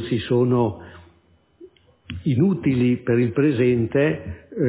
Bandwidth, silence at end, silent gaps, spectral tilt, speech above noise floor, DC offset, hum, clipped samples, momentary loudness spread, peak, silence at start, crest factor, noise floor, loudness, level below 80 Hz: 4 kHz; 0 s; none; -12 dB/octave; 38 dB; under 0.1%; none; under 0.1%; 11 LU; -8 dBFS; 0 s; 14 dB; -58 dBFS; -21 LUFS; -46 dBFS